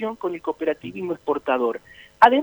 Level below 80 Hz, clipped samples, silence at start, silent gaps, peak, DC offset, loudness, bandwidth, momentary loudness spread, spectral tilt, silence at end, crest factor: -60 dBFS; under 0.1%; 0 s; none; 0 dBFS; under 0.1%; -23 LUFS; over 20 kHz; 13 LU; -6 dB/octave; 0 s; 22 dB